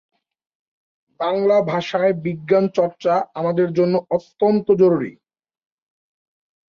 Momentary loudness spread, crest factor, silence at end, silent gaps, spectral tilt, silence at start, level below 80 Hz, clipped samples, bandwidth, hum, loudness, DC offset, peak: 8 LU; 16 dB; 1.65 s; none; -8 dB/octave; 1.2 s; -64 dBFS; under 0.1%; 7 kHz; none; -19 LUFS; under 0.1%; -4 dBFS